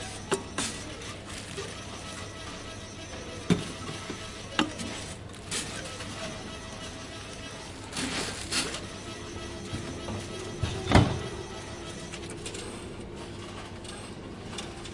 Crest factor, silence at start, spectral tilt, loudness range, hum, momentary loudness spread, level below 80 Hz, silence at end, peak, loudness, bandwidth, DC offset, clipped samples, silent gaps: 28 dB; 0 s; -4 dB/octave; 6 LU; none; 11 LU; -46 dBFS; 0 s; -6 dBFS; -34 LUFS; 11.5 kHz; under 0.1%; under 0.1%; none